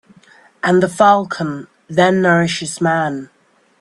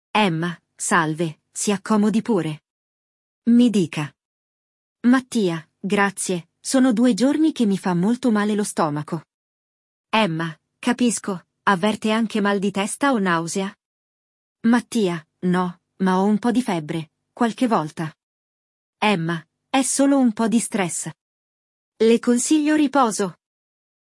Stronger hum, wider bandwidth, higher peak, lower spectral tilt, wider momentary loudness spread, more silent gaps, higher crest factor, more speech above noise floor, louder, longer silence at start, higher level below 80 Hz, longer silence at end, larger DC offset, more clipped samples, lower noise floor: neither; about the same, 12 kHz vs 12 kHz; first, 0 dBFS vs -4 dBFS; about the same, -5.5 dB/octave vs -5 dB/octave; about the same, 11 LU vs 11 LU; second, none vs 2.70-3.42 s, 4.25-4.96 s, 9.34-10.04 s, 13.85-14.55 s, 18.23-18.93 s, 21.21-21.92 s; about the same, 16 dB vs 18 dB; second, 33 dB vs over 70 dB; first, -15 LUFS vs -21 LUFS; first, 0.65 s vs 0.15 s; first, -58 dBFS vs -70 dBFS; second, 0.55 s vs 0.8 s; neither; neither; second, -48 dBFS vs under -90 dBFS